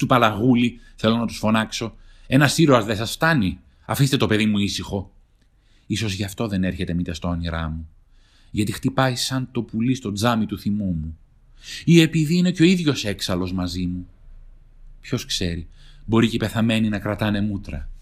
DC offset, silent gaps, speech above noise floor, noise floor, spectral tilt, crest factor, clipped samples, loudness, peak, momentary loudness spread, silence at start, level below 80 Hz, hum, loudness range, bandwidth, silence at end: under 0.1%; none; 36 dB; -57 dBFS; -5.5 dB/octave; 20 dB; under 0.1%; -21 LUFS; -2 dBFS; 12 LU; 0 s; -42 dBFS; none; 7 LU; 15.5 kHz; 0 s